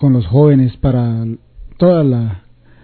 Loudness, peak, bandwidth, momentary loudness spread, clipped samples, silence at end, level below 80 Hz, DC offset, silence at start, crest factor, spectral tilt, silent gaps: -13 LUFS; 0 dBFS; 4.5 kHz; 14 LU; under 0.1%; 0.45 s; -34 dBFS; under 0.1%; 0 s; 12 dB; -13 dB/octave; none